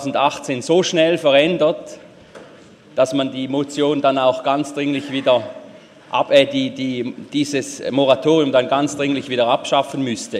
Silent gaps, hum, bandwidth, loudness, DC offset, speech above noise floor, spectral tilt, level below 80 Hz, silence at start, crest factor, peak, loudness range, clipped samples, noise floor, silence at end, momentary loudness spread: none; none; 13 kHz; -18 LUFS; under 0.1%; 26 dB; -4.5 dB/octave; -64 dBFS; 0 s; 18 dB; 0 dBFS; 2 LU; under 0.1%; -44 dBFS; 0 s; 9 LU